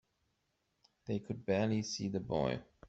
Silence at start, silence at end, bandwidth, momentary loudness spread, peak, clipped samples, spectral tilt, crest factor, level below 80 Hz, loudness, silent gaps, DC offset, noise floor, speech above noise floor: 1.05 s; 0 s; 8 kHz; 8 LU; -20 dBFS; under 0.1%; -5.5 dB/octave; 18 dB; -64 dBFS; -37 LUFS; none; under 0.1%; -81 dBFS; 45 dB